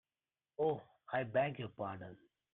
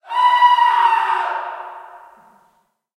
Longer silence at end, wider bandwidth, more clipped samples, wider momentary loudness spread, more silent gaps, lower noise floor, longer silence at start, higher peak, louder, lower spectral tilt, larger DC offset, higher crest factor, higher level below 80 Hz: second, 0.4 s vs 1 s; second, 4.1 kHz vs 10.5 kHz; neither; second, 15 LU vs 19 LU; neither; first, under -90 dBFS vs -62 dBFS; first, 0.6 s vs 0.05 s; second, -22 dBFS vs -2 dBFS; second, -39 LUFS vs -15 LUFS; first, -9 dB/octave vs 0.5 dB/octave; neither; about the same, 18 dB vs 16 dB; about the same, -76 dBFS vs -80 dBFS